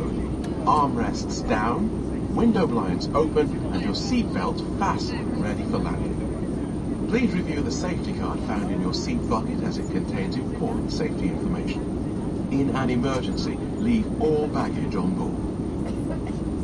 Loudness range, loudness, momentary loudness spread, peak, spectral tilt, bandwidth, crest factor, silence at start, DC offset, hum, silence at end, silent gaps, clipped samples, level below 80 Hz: 3 LU; -25 LUFS; 6 LU; -8 dBFS; -6.5 dB/octave; 11 kHz; 16 dB; 0 s; under 0.1%; none; 0 s; none; under 0.1%; -36 dBFS